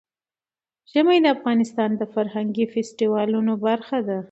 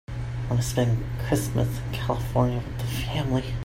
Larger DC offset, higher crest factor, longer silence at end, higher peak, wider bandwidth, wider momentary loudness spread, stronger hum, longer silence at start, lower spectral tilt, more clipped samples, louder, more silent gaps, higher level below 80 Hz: neither; about the same, 16 dB vs 18 dB; about the same, 0.05 s vs 0.05 s; about the same, -6 dBFS vs -8 dBFS; second, 8.2 kHz vs 16.5 kHz; about the same, 7 LU vs 6 LU; neither; first, 0.95 s vs 0.1 s; about the same, -6 dB/octave vs -6 dB/octave; neither; first, -22 LUFS vs -27 LUFS; neither; second, -72 dBFS vs -38 dBFS